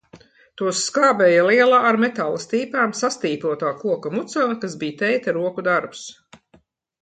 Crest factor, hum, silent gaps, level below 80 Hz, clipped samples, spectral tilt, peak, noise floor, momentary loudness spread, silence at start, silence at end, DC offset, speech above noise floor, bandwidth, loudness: 16 dB; none; none; -70 dBFS; under 0.1%; -4 dB/octave; -4 dBFS; -58 dBFS; 11 LU; 0.15 s; 0.9 s; under 0.1%; 38 dB; 9.4 kHz; -20 LUFS